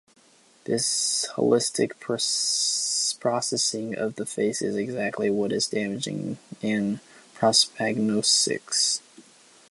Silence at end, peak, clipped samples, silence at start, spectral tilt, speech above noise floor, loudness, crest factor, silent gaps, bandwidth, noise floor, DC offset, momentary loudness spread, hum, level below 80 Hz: 0.5 s; -6 dBFS; under 0.1%; 0.65 s; -2.5 dB/octave; 33 dB; -24 LUFS; 20 dB; none; 11.5 kHz; -58 dBFS; under 0.1%; 10 LU; none; -70 dBFS